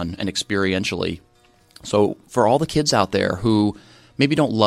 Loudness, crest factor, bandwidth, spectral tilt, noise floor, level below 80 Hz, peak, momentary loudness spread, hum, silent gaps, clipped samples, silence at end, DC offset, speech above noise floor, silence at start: -20 LUFS; 20 dB; 14.5 kHz; -5 dB/octave; -52 dBFS; -48 dBFS; 0 dBFS; 8 LU; none; none; under 0.1%; 0 s; under 0.1%; 32 dB; 0 s